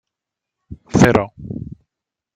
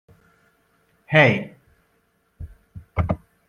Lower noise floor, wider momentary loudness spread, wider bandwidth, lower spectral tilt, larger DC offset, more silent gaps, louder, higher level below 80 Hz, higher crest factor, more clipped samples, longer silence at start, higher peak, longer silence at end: first, -84 dBFS vs -66 dBFS; second, 18 LU vs 27 LU; first, 15 kHz vs 7 kHz; about the same, -6.5 dB/octave vs -7 dB/octave; neither; neither; first, -16 LUFS vs -20 LUFS; about the same, -42 dBFS vs -44 dBFS; second, 18 dB vs 24 dB; neither; second, 0.7 s vs 1.1 s; about the same, -2 dBFS vs -2 dBFS; first, 0.7 s vs 0.35 s